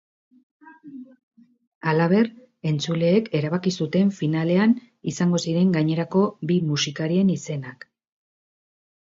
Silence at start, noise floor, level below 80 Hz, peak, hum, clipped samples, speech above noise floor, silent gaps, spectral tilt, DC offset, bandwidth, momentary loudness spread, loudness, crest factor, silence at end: 0.65 s; -42 dBFS; -66 dBFS; -8 dBFS; none; under 0.1%; 21 dB; 1.23-1.31 s, 1.67-1.81 s; -6.5 dB/octave; under 0.1%; 7.8 kHz; 12 LU; -22 LUFS; 16 dB; 1.35 s